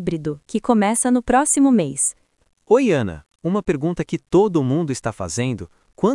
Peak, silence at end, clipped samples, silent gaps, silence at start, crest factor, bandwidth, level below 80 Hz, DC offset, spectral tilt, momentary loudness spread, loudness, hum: -2 dBFS; 0 s; under 0.1%; none; 0 s; 16 dB; 12 kHz; -48 dBFS; under 0.1%; -5.5 dB/octave; 10 LU; -19 LUFS; none